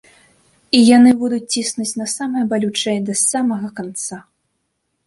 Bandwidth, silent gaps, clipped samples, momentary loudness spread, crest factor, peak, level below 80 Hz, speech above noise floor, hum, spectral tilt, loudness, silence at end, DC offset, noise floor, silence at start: 11.5 kHz; none; under 0.1%; 15 LU; 16 dB; -2 dBFS; -60 dBFS; 55 dB; none; -3.5 dB/octave; -16 LUFS; 0.85 s; under 0.1%; -71 dBFS; 0.75 s